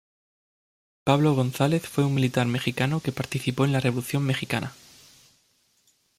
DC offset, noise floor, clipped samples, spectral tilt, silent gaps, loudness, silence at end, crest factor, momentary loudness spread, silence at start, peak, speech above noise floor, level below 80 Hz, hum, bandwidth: under 0.1%; -67 dBFS; under 0.1%; -6 dB/octave; none; -25 LUFS; 1.45 s; 20 dB; 7 LU; 1.05 s; -6 dBFS; 42 dB; -60 dBFS; none; 15.5 kHz